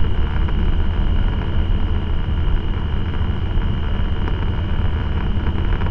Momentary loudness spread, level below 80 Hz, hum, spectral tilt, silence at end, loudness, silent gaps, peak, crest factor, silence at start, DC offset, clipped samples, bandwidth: 2 LU; -20 dBFS; none; -9 dB/octave; 0 s; -22 LUFS; none; -4 dBFS; 12 dB; 0 s; under 0.1%; under 0.1%; 4.2 kHz